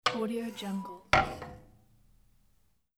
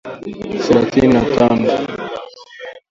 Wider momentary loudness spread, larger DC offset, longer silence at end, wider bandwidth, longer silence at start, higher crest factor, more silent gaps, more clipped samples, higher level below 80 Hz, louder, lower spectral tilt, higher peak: second, 15 LU vs 20 LU; neither; first, 1.35 s vs 0.15 s; first, 18.5 kHz vs 7.8 kHz; about the same, 0.05 s vs 0.05 s; first, 26 dB vs 16 dB; neither; neither; second, -52 dBFS vs -42 dBFS; second, -31 LUFS vs -15 LUFS; second, -4.5 dB/octave vs -6.5 dB/octave; second, -8 dBFS vs 0 dBFS